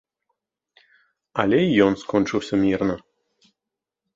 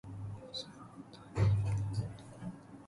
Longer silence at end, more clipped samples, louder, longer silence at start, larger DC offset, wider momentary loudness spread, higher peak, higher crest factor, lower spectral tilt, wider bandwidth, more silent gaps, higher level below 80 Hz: first, 1.15 s vs 0 s; neither; first, -21 LUFS vs -37 LUFS; first, 1.35 s vs 0.05 s; neither; second, 9 LU vs 19 LU; first, -2 dBFS vs -20 dBFS; about the same, 22 dB vs 18 dB; about the same, -6.5 dB/octave vs -7 dB/octave; second, 7.8 kHz vs 11.5 kHz; neither; about the same, -54 dBFS vs -52 dBFS